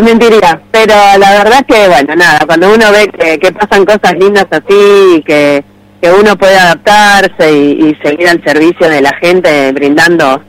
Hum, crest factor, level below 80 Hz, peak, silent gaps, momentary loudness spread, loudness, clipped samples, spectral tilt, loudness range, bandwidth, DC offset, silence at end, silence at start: none; 4 dB; -38 dBFS; 0 dBFS; none; 5 LU; -5 LUFS; 2%; -4 dB/octave; 2 LU; 16.5 kHz; under 0.1%; 0.1 s; 0 s